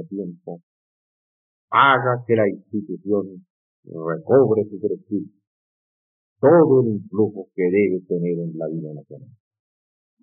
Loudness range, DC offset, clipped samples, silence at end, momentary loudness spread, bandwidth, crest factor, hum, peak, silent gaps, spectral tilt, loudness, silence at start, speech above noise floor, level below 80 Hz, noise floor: 4 LU; under 0.1%; under 0.1%; 1 s; 20 LU; 3.8 kHz; 18 dB; none; -4 dBFS; 0.63-1.68 s, 3.50-3.83 s, 5.47-6.36 s; -4 dB/octave; -20 LUFS; 0 s; over 70 dB; -82 dBFS; under -90 dBFS